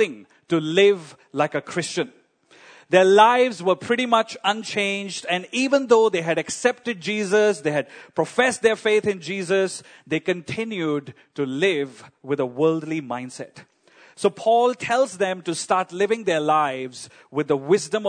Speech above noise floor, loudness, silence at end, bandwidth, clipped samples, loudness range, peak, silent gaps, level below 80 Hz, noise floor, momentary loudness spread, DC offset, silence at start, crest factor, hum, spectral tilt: 31 dB; -22 LUFS; 0 s; 9.6 kHz; under 0.1%; 5 LU; -2 dBFS; none; -70 dBFS; -53 dBFS; 12 LU; under 0.1%; 0 s; 20 dB; none; -4 dB/octave